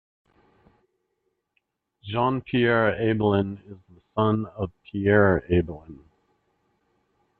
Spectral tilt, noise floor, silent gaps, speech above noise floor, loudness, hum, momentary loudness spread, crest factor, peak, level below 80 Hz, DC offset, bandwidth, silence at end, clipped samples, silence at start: -10.5 dB/octave; -76 dBFS; none; 53 dB; -24 LUFS; none; 15 LU; 20 dB; -6 dBFS; -52 dBFS; under 0.1%; 4.3 kHz; 1.45 s; under 0.1%; 2.05 s